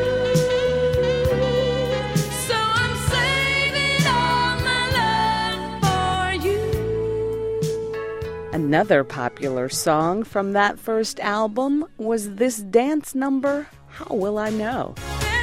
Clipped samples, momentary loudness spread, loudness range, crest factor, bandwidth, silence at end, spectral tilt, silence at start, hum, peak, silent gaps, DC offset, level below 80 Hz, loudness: under 0.1%; 8 LU; 4 LU; 18 dB; 16.5 kHz; 0 s; -4.5 dB/octave; 0 s; none; -4 dBFS; none; under 0.1%; -38 dBFS; -21 LUFS